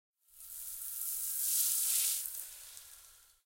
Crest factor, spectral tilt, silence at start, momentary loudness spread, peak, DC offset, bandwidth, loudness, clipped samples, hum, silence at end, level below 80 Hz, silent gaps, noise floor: 24 dB; 5 dB/octave; 0.35 s; 21 LU; -14 dBFS; under 0.1%; 17 kHz; -32 LUFS; under 0.1%; none; 0.3 s; -72 dBFS; none; -60 dBFS